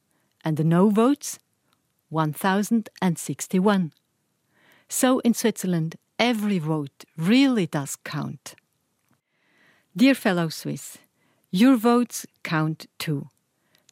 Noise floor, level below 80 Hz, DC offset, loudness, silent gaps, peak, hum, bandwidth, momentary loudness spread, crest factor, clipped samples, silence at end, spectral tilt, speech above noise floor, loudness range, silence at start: -72 dBFS; -74 dBFS; under 0.1%; -23 LUFS; none; -4 dBFS; none; 16 kHz; 14 LU; 20 dB; under 0.1%; 0.65 s; -5.5 dB/octave; 49 dB; 4 LU; 0.45 s